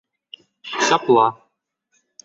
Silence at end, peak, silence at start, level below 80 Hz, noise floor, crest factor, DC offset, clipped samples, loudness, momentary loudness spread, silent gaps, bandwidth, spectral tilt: 0.9 s; -2 dBFS; 0.65 s; -70 dBFS; -71 dBFS; 20 dB; under 0.1%; under 0.1%; -18 LUFS; 16 LU; none; 7.8 kHz; -3 dB/octave